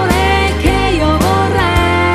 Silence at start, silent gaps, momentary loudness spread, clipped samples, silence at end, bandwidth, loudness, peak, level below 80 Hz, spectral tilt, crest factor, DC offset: 0 s; none; 1 LU; under 0.1%; 0 s; 14 kHz; -12 LUFS; 0 dBFS; -20 dBFS; -5.5 dB/octave; 12 dB; under 0.1%